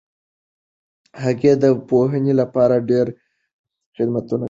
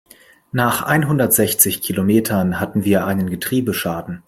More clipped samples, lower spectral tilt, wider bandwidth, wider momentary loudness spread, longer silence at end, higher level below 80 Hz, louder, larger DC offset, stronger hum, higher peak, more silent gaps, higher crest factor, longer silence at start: neither; first, -8.5 dB/octave vs -4.5 dB/octave; second, 7.6 kHz vs 16.5 kHz; about the same, 9 LU vs 7 LU; about the same, 0 s vs 0.1 s; second, -58 dBFS vs -52 dBFS; about the same, -18 LUFS vs -17 LUFS; neither; neither; about the same, -2 dBFS vs 0 dBFS; first, 3.53-3.64 s, 3.86-3.92 s vs none; about the same, 16 dB vs 18 dB; first, 1.15 s vs 0.55 s